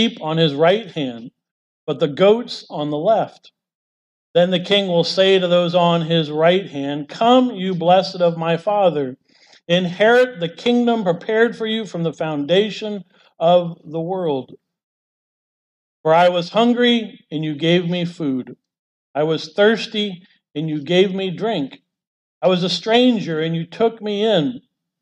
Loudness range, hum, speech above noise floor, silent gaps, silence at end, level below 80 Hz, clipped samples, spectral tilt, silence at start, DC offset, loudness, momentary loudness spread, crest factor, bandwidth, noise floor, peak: 4 LU; none; over 72 dB; 1.51-1.87 s, 3.75-4.34 s, 14.83-16.04 s, 18.79-19.14 s, 22.07-22.41 s; 0.45 s; -70 dBFS; under 0.1%; -6 dB/octave; 0 s; under 0.1%; -18 LUFS; 12 LU; 16 dB; 10 kHz; under -90 dBFS; -4 dBFS